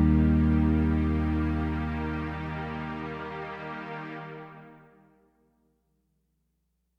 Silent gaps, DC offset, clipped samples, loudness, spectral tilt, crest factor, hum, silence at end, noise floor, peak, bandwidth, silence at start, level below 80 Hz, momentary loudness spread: none; under 0.1%; under 0.1%; -29 LUFS; -9.5 dB/octave; 18 dB; none; 2.2 s; -76 dBFS; -12 dBFS; 5.4 kHz; 0 s; -36 dBFS; 17 LU